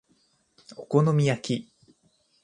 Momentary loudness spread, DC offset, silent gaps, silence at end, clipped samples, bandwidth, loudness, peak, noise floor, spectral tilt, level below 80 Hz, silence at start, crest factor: 22 LU; under 0.1%; none; 0.8 s; under 0.1%; 10 kHz; -25 LUFS; -6 dBFS; -67 dBFS; -7 dB/octave; -66 dBFS; 0.7 s; 22 dB